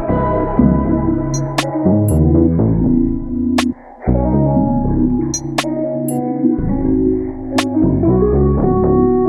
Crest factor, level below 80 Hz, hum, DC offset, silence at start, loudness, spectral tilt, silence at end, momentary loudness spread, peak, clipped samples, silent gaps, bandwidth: 14 dB; -24 dBFS; none; under 0.1%; 0 s; -15 LUFS; -7 dB/octave; 0 s; 6 LU; 0 dBFS; under 0.1%; none; 14.5 kHz